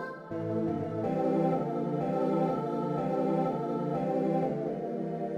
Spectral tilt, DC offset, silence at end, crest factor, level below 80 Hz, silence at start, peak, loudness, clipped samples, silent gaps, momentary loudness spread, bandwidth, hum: -9.5 dB/octave; under 0.1%; 0 s; 14 dB; -72 dBFS; 0 s; -18 dBFS; -31 LUFS; under 0.1%; none; 6 LU; 9.4 kHz; none